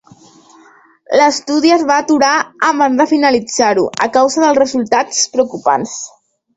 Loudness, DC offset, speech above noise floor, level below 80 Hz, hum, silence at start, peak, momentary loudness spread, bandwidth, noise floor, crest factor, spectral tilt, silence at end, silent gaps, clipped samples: -13 LUFS; under 0.1%; 33 dB; -56 dBFS; none; 1.1 s; 0 dBFS; 4 LU; 8.4 kHz; -46 dBFS; 14 dB; -2.5 dB/octave; 0.5 s; none; under 0.1%